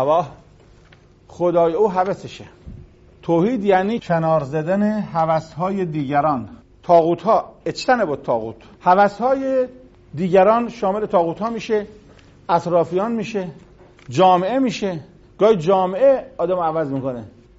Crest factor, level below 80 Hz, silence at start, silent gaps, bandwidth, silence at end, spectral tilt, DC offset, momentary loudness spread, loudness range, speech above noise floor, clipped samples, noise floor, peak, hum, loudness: 16 dB; -52 dBFS; 0 s; none; 8 kHz; 0.3 s; -5.5 dB/octave; under 0.1%; 13 LU; 3 LU; 31 dB; under 0.1%; -49 dBFS; -2 dBFS; none; -19 LUFS